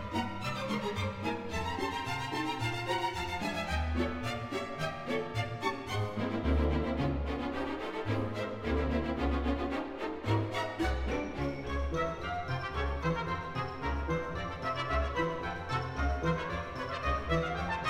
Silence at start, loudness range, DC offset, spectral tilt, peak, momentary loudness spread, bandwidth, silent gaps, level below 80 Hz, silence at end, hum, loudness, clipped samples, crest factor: 0 s; 1 LU; under 0.1%; -6 dB/octave; -18 dBFS; 5 LU; 15.5 kHz; none; -40 dBFS; 0 s; none; -34 LUFS; under 0.1%; 16 dB